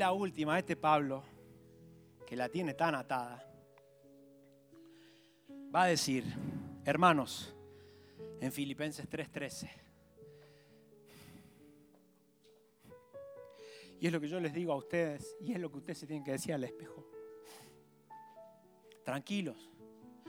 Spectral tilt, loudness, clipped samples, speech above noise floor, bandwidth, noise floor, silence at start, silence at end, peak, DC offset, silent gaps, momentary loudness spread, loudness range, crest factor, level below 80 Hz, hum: -5 dB/octave; -36 LUFS; under 0.1%; 33 dB; over 20 kHz; -68 dBFS; 0 s; 0 s; -12 dBFS; under 0.1%; none; 26 LU; 12 LU; 26 dB; -74 dBFS; none